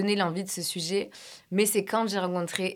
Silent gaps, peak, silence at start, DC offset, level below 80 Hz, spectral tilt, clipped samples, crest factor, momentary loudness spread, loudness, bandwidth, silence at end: none; -8 dBFS; 0 s; under 0.1%; -76 dBFS; -4 dB/octave; under 0.1%; 20 dB; 7 LU; -28 LUFS; 19 kHz; 0 s